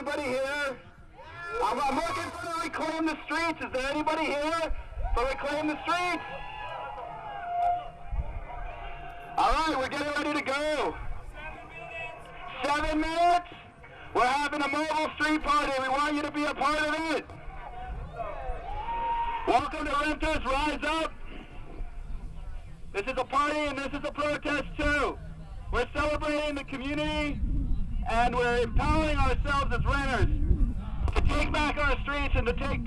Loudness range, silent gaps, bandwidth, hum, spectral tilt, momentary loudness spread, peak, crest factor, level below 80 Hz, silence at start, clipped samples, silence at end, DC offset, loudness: 4 LU; none; 12.5 kHz; none; -5 dB/octave; 16 LU; -10 dBFS; 20 dB; -36 dBFS; 0 s; under 0.1%; 0 s; under 0.1%; -29 LUFS